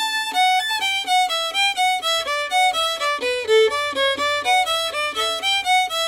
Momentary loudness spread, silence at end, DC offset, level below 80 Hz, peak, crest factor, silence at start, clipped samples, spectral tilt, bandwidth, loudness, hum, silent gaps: 4 LU; 0 s; under 0.1%; -60 dBFS; -8 dBFS; 12 dB; 0 s; under 0.1%; 1 dB/octave; 16 kHz; -19 LUFS; none; none